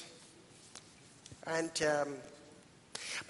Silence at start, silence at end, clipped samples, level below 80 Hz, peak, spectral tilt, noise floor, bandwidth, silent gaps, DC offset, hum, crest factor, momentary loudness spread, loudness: 0 s; 0 s; under 0.1%; -74 dBFS; -20 dBFS; -3 dB/octave; -60 dBFS; 11.5 kHz; none; under 0.1%; none; 22 dB; 24 LU; -37 LUFS